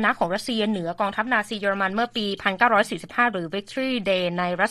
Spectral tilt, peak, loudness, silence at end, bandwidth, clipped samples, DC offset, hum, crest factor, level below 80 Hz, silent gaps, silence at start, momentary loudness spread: -4.5 dB/octave; -4 dBFS; -23 LUFS; 0 s; 13.5 kHz; under 0.1%; under 0.1%; none; 20 dB; -60 dBFS; none; 0 s; 6 LU